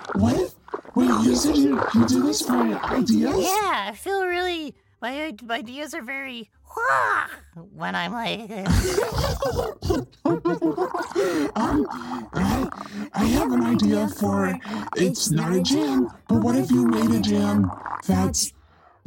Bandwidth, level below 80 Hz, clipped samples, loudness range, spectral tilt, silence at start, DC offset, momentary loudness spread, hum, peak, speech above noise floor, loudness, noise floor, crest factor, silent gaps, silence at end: 17 kHz; -40 dBFS; under 0.1%; 6 LU; -5 dB/octave; 0 s; under 0.1%; 11 LU; none; -6 dBFS; 29 dB; -23 LUFS; -52 dBFS; 16 dB; none; 0.55 s